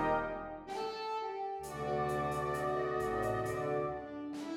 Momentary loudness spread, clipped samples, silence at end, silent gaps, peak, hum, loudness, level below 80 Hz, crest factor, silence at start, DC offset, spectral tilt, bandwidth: 7 LU; under 0.1%; 0 s; none; -20 dBFS; none; -37 LUFS; -58 dBFS; 16 dB; 0 s; under 0.1%; -6 dB/octave; 16.5 kHz